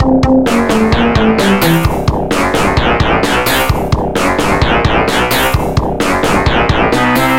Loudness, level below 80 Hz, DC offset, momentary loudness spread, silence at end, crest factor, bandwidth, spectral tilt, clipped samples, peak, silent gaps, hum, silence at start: -11 LUFS; -22 dBFS; under 0.1%; 4 LU; 0 s; 10 dB; 17 kHz; -5 dB/octave; under 0.1%; 0 dBFS; none; none; 0 s